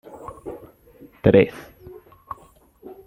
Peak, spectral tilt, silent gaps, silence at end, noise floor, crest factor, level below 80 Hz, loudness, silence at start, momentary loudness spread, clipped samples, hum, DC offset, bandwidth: -2 dBFS; -8.5 dB/octave; none; 0.15 s; -52 dBFS; 22 dB; -50 dBFS; -18 LUFS; 0.25 s; 26 LU; under 0.1%; none; under 0.1%; 12 kHz